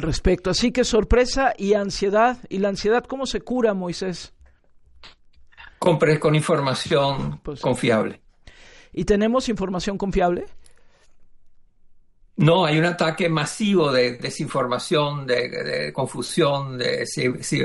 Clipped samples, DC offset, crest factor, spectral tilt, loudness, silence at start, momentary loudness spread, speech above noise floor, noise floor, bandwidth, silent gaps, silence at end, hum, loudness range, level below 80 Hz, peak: under 0.1%; under 0.1%; 18 dB; -5 dB/octave; -21 LUFS; 0 s; 9 LU; 31 dB; -52 dBFS; 11.5 kHz; none; 0 s; none; 4 LU; -38 dBFS; -4 dBFS